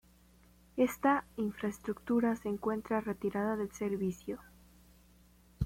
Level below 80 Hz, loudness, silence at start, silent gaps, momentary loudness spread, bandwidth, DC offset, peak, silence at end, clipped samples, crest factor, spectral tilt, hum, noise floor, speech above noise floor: -62 dBFS; -35 LUFS; 0.75 s; none; 10 LU; 16.5 kHz; under 0.1%; -16 dBFS; 0 s; under 0.1%; 20 dB; -7 dB/octave; none; -63 dBFS; 29 dB